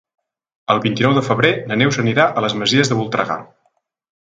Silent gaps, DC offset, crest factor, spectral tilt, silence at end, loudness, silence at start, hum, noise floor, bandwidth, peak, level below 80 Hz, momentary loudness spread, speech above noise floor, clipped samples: none; under 0.1%; 18 dB; -5 dB/octave; 0.8 s; -16 LUFS; 0.7 s; none; -65 dBFS; 9.2 kHz; 0 dBFS; -56 dBFS; 6 LU; 49 dB; under 0.1%